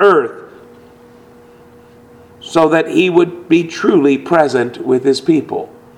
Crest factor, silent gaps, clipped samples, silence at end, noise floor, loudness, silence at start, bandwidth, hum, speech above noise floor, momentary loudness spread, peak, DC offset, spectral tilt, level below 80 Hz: 14 dB; none; under 0.1%; 0.3 s; -42 dBFS; -14 LUFS; 0 s; 11.5 kHz; none; 29 dB; 12 LU; 0 dBFS; under 0.1%; -6 dB/octave; -58 dBFS